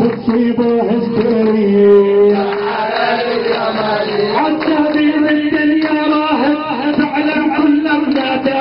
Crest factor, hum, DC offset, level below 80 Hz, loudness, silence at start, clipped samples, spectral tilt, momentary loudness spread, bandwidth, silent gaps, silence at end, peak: 12 dB; none; under 0.1%; -50 dBFS; -13 LUFS; 0 s; under 0.1%; -9.5 dB/octave; 5 LU; 5.6 kHz; none; 0 s; 0 dBFS